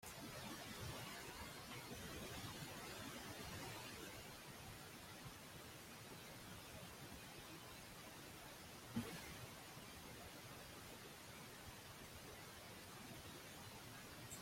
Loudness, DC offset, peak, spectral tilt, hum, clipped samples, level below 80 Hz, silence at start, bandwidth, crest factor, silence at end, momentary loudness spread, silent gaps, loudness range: -54 LUFS; under 0.1%; -32 dBFS; -3.5 dB/octave; none; under 0.1%; -70 dBFS; 0 s; 16.5 kHz; 22 dB; 0 s; 5 LU; none; 4 LU